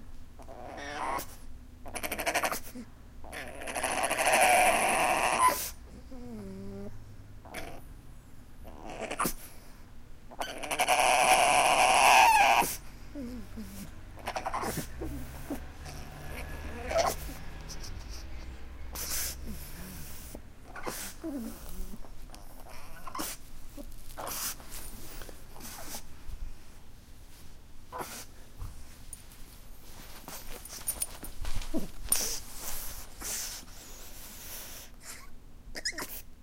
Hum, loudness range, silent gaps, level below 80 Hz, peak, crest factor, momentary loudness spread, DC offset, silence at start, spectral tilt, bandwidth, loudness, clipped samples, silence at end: none; 21 LU; none; -44 dBFS; -10 dBFS; 24 dB; 26 LU; under 0.1%; 0 s; -2 dB/octave; 16.5 kHz; -29 LUFS; under 0.1%; 0 s